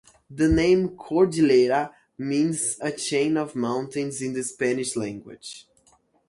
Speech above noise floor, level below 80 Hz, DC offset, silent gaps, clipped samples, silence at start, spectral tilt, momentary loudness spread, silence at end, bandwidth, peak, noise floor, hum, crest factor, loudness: 39 dB; -46 dBFS; under 0.1%; none; under 0.1%; 0.3 s; -5 dB/octave; 18 LU; 0.7 s; 11.5 kHz; -8 dBFS; -62 dBFS; none; 16 dB; -23 LUFS